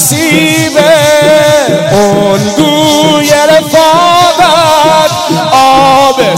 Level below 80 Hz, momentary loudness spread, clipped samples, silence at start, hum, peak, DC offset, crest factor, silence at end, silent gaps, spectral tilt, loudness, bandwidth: -40 dBFS; 3 LU; 4%; 0 s; none; 0 dBFS; under 0.1%; 6 dB; 0 s; none; -3.5 dB/octave; -5 LUFS; 16.5 kHz